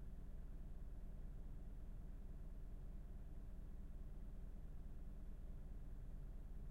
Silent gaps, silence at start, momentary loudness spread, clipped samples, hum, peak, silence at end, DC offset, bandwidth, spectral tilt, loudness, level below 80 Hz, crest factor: none; 0 s; 1 LU; under 0.1%; none; -42 dBFS; 0 s; under 0.1%; 4.1 kHz; -8 dB/octave; -58 LUFS; -52 dBFS; 8 dB